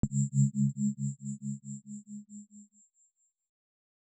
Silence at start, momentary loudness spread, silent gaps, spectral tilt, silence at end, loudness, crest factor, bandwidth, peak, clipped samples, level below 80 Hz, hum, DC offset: 0.05 s; 20 LU; none; -9.5 dB/octave; 1.4 s; -32 LUFS; 20 dB; 8.4 kHz; -14 dBFS; under 0.1%; -58 dBFS; none; under 0.1%